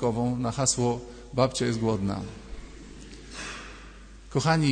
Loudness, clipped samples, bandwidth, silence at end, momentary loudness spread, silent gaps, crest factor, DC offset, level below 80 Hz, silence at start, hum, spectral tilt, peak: -28 LUFS; under 0.1%; 9.6 kHz; 0 s; 21 LU; none; 20 dB; under 0.1%; -46 dBFS; 0 s; none; -5 dB/octave; -8 dBFS